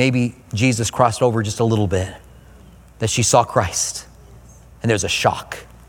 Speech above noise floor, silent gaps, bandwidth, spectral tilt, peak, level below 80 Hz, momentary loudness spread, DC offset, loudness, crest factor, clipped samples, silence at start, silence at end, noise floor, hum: 26 dB; none; 18 kHz; -4.5 dB/octave; 0 dBFS; -44 dBFS; 11 LU; under 0.1%; -19 LUFS; 20 dB; under 0.1%; 0 s; 0.25 s; -44 dBFS; none